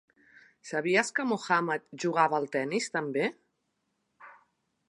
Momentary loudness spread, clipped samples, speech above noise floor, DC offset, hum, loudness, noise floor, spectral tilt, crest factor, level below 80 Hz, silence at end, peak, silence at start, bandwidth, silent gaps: 7 LU; under 0.1%; 50 dB; under 0.1%; none; -29 LUFS; -79 dBFS; -4 dB/octave; 22 dB; -84 dBFS; 0.55 s; -8 dBFS; 0.65 s; 11.5 kHz; none